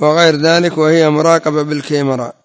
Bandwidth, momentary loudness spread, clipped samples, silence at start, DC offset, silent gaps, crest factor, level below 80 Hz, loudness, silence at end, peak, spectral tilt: 8 kHz; 7 LU; under 0.1%; 0 s; under 0.1%; none; 12 dB; -60 dBFS; -12 LUFS; 0.15 s; 0 dBFS; -5 dB/octave